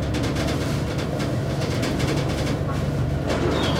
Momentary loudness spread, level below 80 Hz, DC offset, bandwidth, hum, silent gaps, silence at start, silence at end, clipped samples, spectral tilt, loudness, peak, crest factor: 2 LU; -34 dBFS; under 0.1%; 16 kHz; none; none; 0 s; 0 s; under 0.1%; -6 dB/octave; -24 LUFS; -10 dBFS; 14 dB